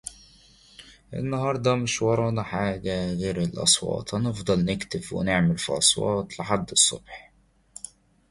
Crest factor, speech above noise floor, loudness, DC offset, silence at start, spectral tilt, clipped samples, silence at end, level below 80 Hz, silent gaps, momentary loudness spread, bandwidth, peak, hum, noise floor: 22 dB; 30 dB; -24 LUFS; under 0.1%; 0.05 s; -3.5 dB/octave; under 0.1%; 1.1 s; -50 dBFS; none; 19 LU; 11.5 kHz; -4 dBFS; none; -55 dBFS